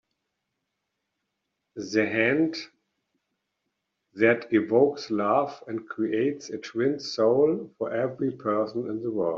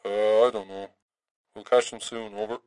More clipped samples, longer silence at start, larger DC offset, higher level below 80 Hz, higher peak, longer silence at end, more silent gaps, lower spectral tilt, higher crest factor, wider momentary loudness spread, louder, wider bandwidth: neither; first, 1.75 s vs 0.05 s; neither; about the same, -72 dBFS vs -76 dBFS; about the same, -8 dBFS vs -8 dBFS; about the same, 0 s vs 0.1 s; second, none vs 1.02-1.09 s, 1.31-1.44 s; first, -4.5 dB/octave vs -3 dB/octave; about the same, 20 dB vs 18 dB; second, 13 LU vs 18 LU; about the same, -26 LUFS vs -25 LUFS; second, 7.4 kHz vs 11 kHz